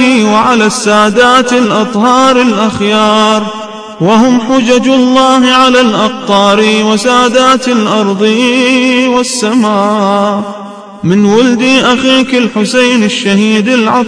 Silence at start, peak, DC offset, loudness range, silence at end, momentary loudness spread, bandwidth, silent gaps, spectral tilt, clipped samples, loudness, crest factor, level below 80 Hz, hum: 0 s; 0 dBFS; 0.2%; 2 LU; 0 s; 5 LU; 11 kHz; none; -4 dB/octave; 2%; -8 LUFS; 8 dB; -46 dBFS; none